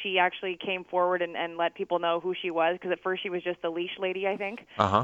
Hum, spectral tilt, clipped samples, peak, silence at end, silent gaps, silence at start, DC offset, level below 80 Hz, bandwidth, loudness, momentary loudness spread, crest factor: none; -6 dB/octave; under 0.1%; -6 dBFS; 0 s; none; 0 s; under 0.1%; -68 dBFS; 7.8 kHz; -29 LUFS; 6 LU; 24 dB